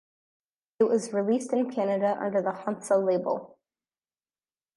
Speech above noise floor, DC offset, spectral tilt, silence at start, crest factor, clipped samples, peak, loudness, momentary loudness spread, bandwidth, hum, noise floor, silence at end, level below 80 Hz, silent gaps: over 64 dB; under 0.1%; -6 dB/octave; 0.8 s; 18 dB; under 0.1%; -10 dBFS; -27 LUFS; 7 LU; 11.5 kHz; none; under -90 dBFS; 1.3 s; -80 dBFS; none